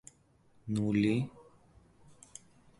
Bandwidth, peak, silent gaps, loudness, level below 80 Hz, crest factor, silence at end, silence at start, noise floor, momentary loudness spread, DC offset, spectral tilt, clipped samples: 11.5 kHz; -18 dBFS; none; -32 LUFS; -64 dBFS; 20 dB; 1.4 s; 0.65 s; -66 dBFS; 23 LU; under 0.1%; -7 dB/octave; under 0.1%